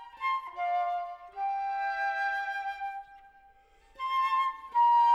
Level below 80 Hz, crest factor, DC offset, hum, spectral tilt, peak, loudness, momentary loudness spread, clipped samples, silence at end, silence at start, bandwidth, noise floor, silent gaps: -68 dBFS; 14 dB; under 0.1%; none; -0.5 dB/octave; -16 dBFS; -30 LUFS; 12 LU; under 0.1%; 0 s; 0 s; 12 kHz; -60 dBFS; none